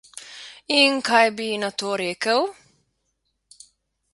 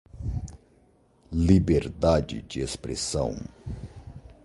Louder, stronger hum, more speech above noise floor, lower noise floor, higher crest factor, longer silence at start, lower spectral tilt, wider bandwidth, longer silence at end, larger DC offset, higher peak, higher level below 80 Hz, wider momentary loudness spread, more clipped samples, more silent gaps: first, -20 LUFS vs -26 LUFS; neither; first, 53 dB vs 36 dB; first, -74 dBFS vs -61 dBFS; about the same, 22 dB vs 22 dB; about the same, 0.15 s vs 0.15 s; second, -2.5 dB/octave vs -6 dB/octave; about the same, 11.5 kHz vs 11.5 kHz; first, 1.6 s vs 0.15 s; neither; first, -2 dBFS vs -6 dBFS; second, -72 dBFS vs -38 dBFS; about the same, 21 LU vs 21 LU; neither; neither